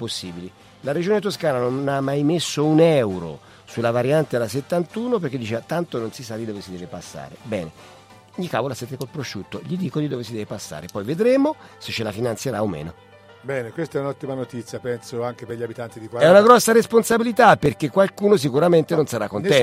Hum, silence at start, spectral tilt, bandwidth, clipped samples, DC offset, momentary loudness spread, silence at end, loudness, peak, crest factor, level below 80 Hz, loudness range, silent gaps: none; 0 s; -5.5 dB/octave; 16 kHz; under 0.1%; under 0.1%; 18 LU; 0 s; -21 LUFS; 0 dBFS; 20 dB; -58 dBFS; 13 LU; none